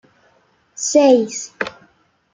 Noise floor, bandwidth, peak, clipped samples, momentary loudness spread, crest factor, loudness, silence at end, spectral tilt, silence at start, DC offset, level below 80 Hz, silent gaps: -58 dBFS; 9.6 kHz; -2 dBFS; under 0.1%; 15 LU; 18 dB; -17 LUFS; 0.65 s; -3 dB/octave; 0.8 s; under 0.1%; -66 dBFS; none